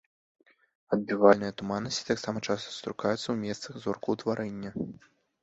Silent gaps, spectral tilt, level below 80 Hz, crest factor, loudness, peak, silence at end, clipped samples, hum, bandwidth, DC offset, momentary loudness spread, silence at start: none; -5 dB/octave; -66 dBFS; 24 dB; -30 LUFS; -6 dBFS; 0.5 s; under 0.1%; none; 8 kHz; under 0.1%; 14 LU; 0.9 s